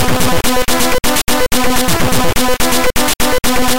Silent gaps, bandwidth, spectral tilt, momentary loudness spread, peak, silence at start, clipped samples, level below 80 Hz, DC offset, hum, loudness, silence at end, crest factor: none; 17.5 kHz; -3 dB/octave; 1 LU; -2 dBFS; 0 s; under 0.1%; -24 dBFS; 20%; none; -13 LUFS; 0 s; 8 dB